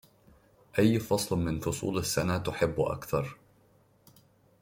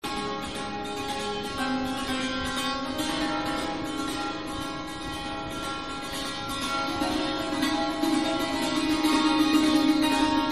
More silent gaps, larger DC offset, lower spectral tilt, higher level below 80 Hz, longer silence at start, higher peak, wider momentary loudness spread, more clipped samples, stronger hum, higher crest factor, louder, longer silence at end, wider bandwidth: neither; second, under 0.1% vs 0.4%; first, -5.5 dB/octave vs -3.5 dB/octave; second, -54 dBFS vs -48 dBFS; first, 0.75 s vs 0 s; about the same, -10 dBFS vs -10 dBFS; second, 7 LU vs 10 LU; neither; neither; about the same, 20 dB vs 16 dB; second, -30 LUFS vs -27 LUFS; first, 1.3 s vs 0 s; first, 16.5 kHz vs 14 kHz